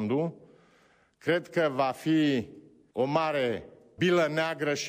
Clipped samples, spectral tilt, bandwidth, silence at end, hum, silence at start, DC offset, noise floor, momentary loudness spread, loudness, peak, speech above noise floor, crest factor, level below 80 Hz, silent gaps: under 0.1%; -5.5 dB/octave; 15.5 kHz; 0 s; none; 0 s; under 0.1%; -64 dBFS; 10 LU; -28 LUFS; -14 dBFS; 36 dB; 14 dB; -70 dBFS; none